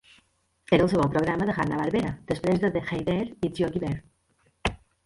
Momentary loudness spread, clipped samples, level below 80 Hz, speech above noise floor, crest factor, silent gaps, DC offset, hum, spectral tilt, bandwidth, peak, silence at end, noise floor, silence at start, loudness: 9 LU; under 0.1%; -48 dBFS; 42 dB; 20 dB; none; under 0.1%; none; -7 dB/octave; 11.5 kHz; -8 dBFS; 0.3 s; -67 dBFS; 0.7 s; -26 LUFS